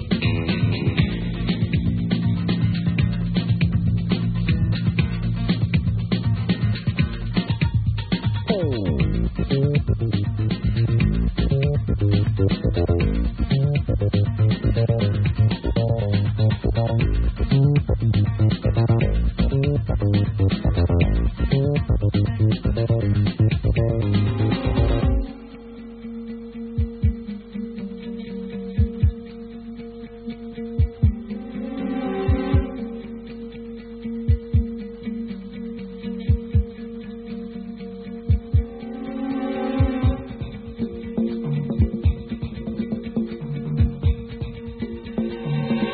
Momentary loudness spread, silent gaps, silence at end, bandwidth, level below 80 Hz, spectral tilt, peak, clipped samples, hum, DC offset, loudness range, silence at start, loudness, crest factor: 13 LU; none; 0 s; 4.8 kHz; -28 dBFS; -12.5 dB/octave; -4 dBFS; under 0.1%; none; under 0.1%; 7 LU; 0 s; -23 LUFS; 16 dB